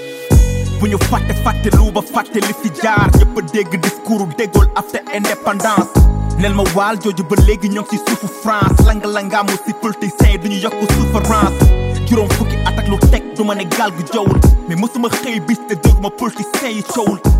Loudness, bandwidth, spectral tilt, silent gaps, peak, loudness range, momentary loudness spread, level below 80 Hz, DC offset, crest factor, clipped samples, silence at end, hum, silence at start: -15 LUFS; 16.5 kHz; -6 dB/octave; none; 0 dBFS; 1 LU; 7 LU; -16 dBFS; under 0.1%; 12 dB; under 0.1%; 0 s; none; 0 s